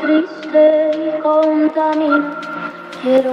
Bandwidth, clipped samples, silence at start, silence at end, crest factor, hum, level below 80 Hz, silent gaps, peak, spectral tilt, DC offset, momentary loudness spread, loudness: 6.8 kHz; under 0.1%; 0 s; 0 s; 14 dB; none; -70 dBFS; none; -2 dBFS; -6 dB/octave; under 0.1%; 13 LU; -15 LUFS